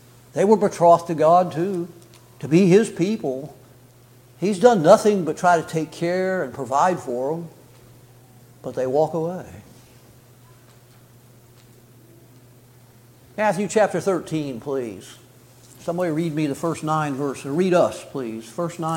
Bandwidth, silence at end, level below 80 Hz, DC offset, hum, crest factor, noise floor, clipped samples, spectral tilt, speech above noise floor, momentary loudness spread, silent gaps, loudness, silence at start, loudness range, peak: 17 kHz; 0 s; -62 dBFS; under 0.1%; none; 20 dB; -50 dBFS; under 0.1%; -6 dB/octave; 30 dB; 16 LU; none; -21 LUFS; 0.35 s; 10 LU; -2 dBFS